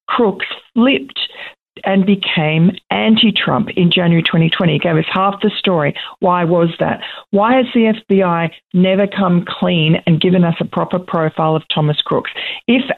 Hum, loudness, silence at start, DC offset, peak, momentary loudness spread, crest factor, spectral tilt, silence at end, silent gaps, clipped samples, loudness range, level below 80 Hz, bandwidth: none; -14 LUFS; 0.1 s; under 0.1%; -2 dBFS; 7 LU; 12 dB; -9 dB/octave; 0 s; none; under 0.1%; 2 LU; -54 dBFS; 4.3 kHz